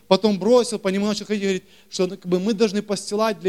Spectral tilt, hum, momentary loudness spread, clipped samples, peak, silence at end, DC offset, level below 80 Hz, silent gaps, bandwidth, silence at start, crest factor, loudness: -5 dB/octave; none; 8 LU; under 0.1%; -2 dBFS; 0 s; 0.2%; -64 dBFS; none; 14 kHz; 0.1 s; 20 dB; -22 LUFS